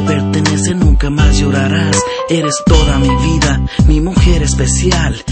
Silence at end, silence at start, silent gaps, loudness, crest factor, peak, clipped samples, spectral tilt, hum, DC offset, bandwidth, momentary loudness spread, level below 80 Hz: 0 s; 0 s; none; -12 LUFS; 10 dB; 0 dBFS; under 0.1%; -5 dB/octave; none; under 0.1%; 8.8 kHz; 3 LU; -14 dBFS